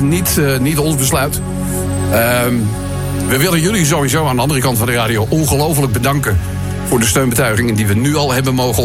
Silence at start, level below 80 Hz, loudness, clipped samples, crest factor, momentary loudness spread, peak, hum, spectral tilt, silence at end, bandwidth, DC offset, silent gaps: 0 s; -30 dBFS; -14 LUFS; under 0.1%; 14 dB; 6 LU; 0 dBFS; none; -4.5 dB/octave; 0 s; 16.5 kHz; 0.1%; none